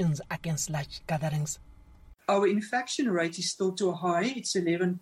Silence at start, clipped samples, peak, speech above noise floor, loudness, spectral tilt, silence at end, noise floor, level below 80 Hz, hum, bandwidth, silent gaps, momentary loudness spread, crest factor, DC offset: 0 s; under 0.1%; -14 dBFS; 24 dB; -29 LUFS; -4.5 dB/octave; 0 s; -53 dBFS; -58 dBFS; none; 15 kHz; none; 7 LU; 14 dB; under 0.1%